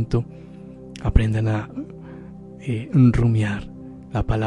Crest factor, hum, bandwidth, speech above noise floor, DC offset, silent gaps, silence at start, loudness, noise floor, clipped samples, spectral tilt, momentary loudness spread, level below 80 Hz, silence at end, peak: 18 dB; none; 9.8 kHz; 19 dB; under 0.1%; none; 0 s; -21 LUFS; -39 dBFS; under 0.1%; -8.5 dB/octave; 22 LU; -30 dBFS; 0 s; -4 dBFS